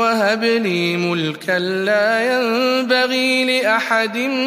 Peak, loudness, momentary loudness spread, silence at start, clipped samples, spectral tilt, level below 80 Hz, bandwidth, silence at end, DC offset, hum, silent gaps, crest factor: -2 dBFS; -17 LUFS; 4 LU; 0 s; under 0.1%; -4.5 dB/octave; -70 dBFS; 15.5 kHz; 0 s; under 0.1%; none; none; 16 dB